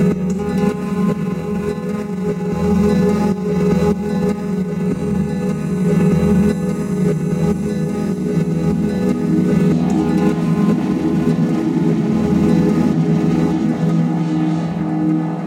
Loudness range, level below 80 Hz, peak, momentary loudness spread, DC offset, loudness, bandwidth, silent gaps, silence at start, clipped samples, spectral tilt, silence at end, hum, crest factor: 2 LU; -38 dBFS; -2 dBFS; 6 LU; under 0.1%; -17 LUFS; 12.5 kHz; none; 0 s; under 0.1%; -8.5 dB/octave; 0 s; none; 14 dB